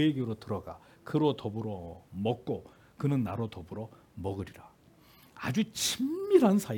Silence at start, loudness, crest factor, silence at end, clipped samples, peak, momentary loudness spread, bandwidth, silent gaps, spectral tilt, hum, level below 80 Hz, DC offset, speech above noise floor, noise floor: 0 s; -31 LUFS; 22 dB; 0 s; under 0.1%; -10 dBFS; 17 LU; 18 kHz; none; -5.5 dB/octave; none; -66 dBFS; under 0.1%; 29 dB; -60 dBFS